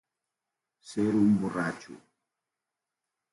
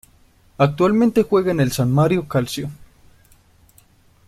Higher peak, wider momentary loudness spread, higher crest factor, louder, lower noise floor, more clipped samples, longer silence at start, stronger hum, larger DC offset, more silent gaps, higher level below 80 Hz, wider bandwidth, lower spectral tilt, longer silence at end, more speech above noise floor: second, -14 dBFS vs -2 dBFS; first, 14 LU vs 9 LU; about the same, 18 dB vs 18 dB; second, -28 LUFS vs -18 LUFS; first, -88 dBFS vs -54 dBFS; neither; first, 0.85 s vs 0.6 s; neither; neither; neither; second, -66 dBFS vs -48 dBFS; second, 11.5 kHz vs 15 kHz; about the same, -7 dB/octave vs -7 dB/octave; second, 1.35 s vs 1.55 s; first, 61 dB vs 36 dB